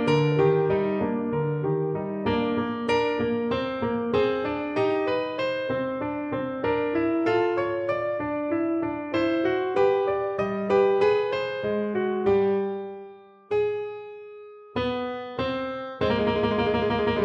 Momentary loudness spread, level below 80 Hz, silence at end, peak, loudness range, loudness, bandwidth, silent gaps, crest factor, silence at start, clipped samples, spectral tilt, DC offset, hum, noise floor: 8 LU; -52 dBFS; 0 s; -10 dBFS; 4 LU; -25 LUFS; 8.6 kHz; none; 16 dB; 0 s; under 0.1%; -7.5 dB/octave; under 0.1%; none; -46 dBFS